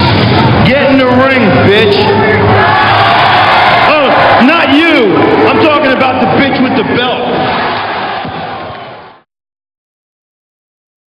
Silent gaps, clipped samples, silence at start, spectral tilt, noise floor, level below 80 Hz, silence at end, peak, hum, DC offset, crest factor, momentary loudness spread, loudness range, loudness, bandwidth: none; 0.6%; 0 s; -7 dB/octave; -31 dBFS; -36 dBFS; 2 s; 0 dBFS; none; under 0.1%; 8 dB; 9 LU; 11 LU; -7 LUFS; 11 kHz